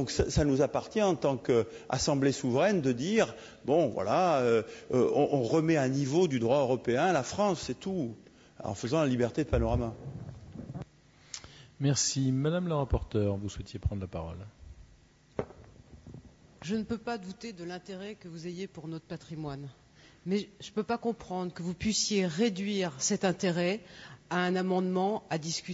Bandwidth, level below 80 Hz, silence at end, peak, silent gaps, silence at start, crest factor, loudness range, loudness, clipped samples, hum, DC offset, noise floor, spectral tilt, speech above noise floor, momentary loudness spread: 8 kHz; -48 dBFS; 0 s; -14 dBFS; none; 0 s; 18 dB; 12 LU; -30 LUFS; under 0.1%; none; under 0.1%; -60 dBFS; -5 dB/octave; 30 dB; 16 LU